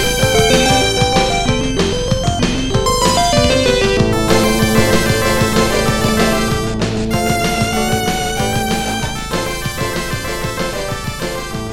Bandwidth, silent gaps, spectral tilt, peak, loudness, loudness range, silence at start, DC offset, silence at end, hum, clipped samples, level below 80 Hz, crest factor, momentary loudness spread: 17.5 kHz; none; -4 dB/octave; 0 dBFS; -15 LUFS; 5 LU; 0 s; under 0.1%; 0 s; none; under 0.1%; -26 dBFS; 14 dB; 8 LU